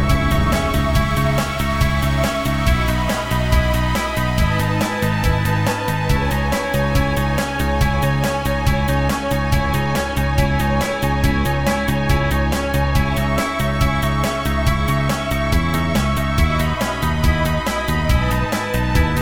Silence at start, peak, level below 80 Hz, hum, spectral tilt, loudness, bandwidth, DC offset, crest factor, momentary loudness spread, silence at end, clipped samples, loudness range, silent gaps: 0 s; -2 dBFS; -24 dBFS; none; -5.5 dB/octave; -19 LUFS; 19 kHz; 2%; 16 dB; 2 LU; 0 s; under 0.1%; 0 LU; none